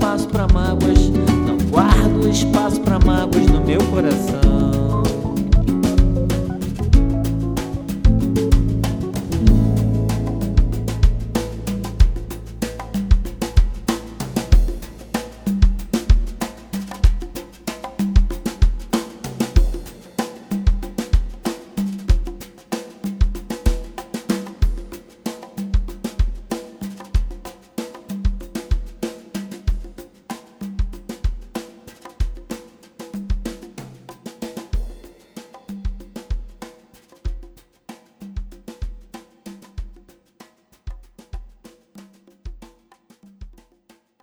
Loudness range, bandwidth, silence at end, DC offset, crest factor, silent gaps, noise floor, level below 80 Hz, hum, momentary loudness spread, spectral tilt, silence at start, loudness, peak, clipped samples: 19 LU; 19.5 kHz; 0.75 s; under 0.1%; 20 dB; none; -56 dBFS; -22 dBFS; none; 21 LU; -6.5 dB/octave; 0 s; -21 LUFS; 0 dBFS; under 0.1%